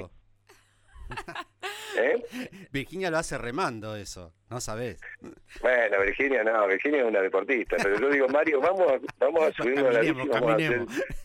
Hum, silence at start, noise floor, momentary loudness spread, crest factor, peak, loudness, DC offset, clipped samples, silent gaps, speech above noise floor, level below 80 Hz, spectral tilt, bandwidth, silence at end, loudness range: none; 0 s; -60 dBFS; 16 LU; 16 dB; -12 dBFS; -26 LUFS; under 0.1%; under 0.1%; none; 34 dB; -50 dBFS; -5 dB/octave; 16.5 kHz; 0 s; 8 LU